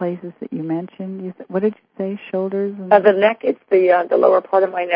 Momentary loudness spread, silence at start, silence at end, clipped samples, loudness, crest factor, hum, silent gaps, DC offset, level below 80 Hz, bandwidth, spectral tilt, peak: 15 LU; 0 s; 0 s; under 0.1%; -18 LUFS; 18 dB; none; none; under 0.1%; -74 dBFS; 5.2 kHz; -9.5 dB/octave; 0 dBFS